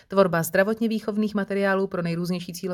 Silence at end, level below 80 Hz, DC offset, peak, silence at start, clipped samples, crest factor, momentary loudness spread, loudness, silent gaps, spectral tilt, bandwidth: 0 s; -60 dBFS; under 0.1%; -6 dBFS; 0.1 s; under 0.1%; 18 dB; 7 LU; -24 LUFS; none; -6 dB/octave; 19 kHz